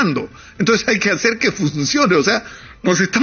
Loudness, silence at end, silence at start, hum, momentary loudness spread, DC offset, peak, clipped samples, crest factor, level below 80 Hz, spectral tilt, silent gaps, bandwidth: -16 LUFS; 0 s; 0 s; none; 10 LU; under 0.1%; -2 dBFS; under 0.1%; 14 dB; -50 dBFS; -4 dB/octave; none; 7.2 kHz